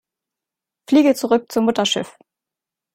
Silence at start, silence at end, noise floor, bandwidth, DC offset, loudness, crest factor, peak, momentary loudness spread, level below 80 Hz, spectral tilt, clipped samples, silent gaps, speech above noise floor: 0.9 s; 0.85 s; -87 dBFS; 16 kHz; under 0.1%; -18 LUFS; 18 dB; -4 dBFS; 7 LU; -64 dBFS; -4 dB/octave; under 0.1%; none; 70 dB